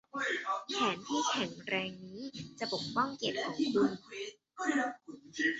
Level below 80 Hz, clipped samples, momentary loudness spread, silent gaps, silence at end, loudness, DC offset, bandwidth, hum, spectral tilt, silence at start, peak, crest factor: -74 dBFS; under 0.1%; 13 LU; none; 0 s; -35 LUFS; under 0.1%; 8 kHz; none; -2 dB/octave; 0.15 s; -18 dBFS; 18 dB